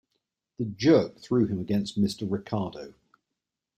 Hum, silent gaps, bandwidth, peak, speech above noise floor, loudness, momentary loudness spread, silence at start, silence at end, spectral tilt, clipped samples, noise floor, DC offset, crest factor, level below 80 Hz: none; none; 12.5 kHz; -10 dBFS; 60 dB; -27 LUFS; 14 LU; 0.6 s; 0.9 s; -7 dB/octave; under 0.1%; -86 dBFS; under 0.1%; 18 dB; -62 dBFS